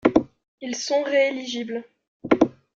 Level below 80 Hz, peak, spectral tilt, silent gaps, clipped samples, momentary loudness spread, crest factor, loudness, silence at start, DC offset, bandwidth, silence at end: -56 dBFS; -2 dBFS; -4 dB/octave; 0.48-0.58 s, 2.08-2.20 s; under 0.1%; 15 LU; 22 dB; -24 LUFS; 0.05 s; under 0.1%; 7.8 kHz; 0.3 s